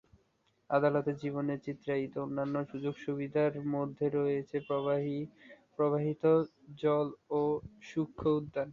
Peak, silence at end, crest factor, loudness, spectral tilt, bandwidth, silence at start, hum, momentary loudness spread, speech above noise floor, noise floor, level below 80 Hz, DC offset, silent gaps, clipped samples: -14 dBFS; 0 s; 18 dB; -33 LUFS; -9 dB/octave; 7 kHz; 0.7 s; none; 9 LU; 41 dB; -74 dBFS; -66 dBFS; under 0.1%; none; under 0.1%